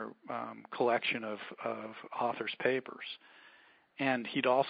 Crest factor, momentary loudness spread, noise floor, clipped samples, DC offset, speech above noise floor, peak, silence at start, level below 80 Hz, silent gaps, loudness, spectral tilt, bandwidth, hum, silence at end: 22 dB; 13 LU; -62 dBFS; under 0.1%; under 0.1%; 28 dB; -14 dBFS; 0 s; -86 dBFS; none; -35 LUFS; -2 dB/octave; 4.9 kHz; none; 0 s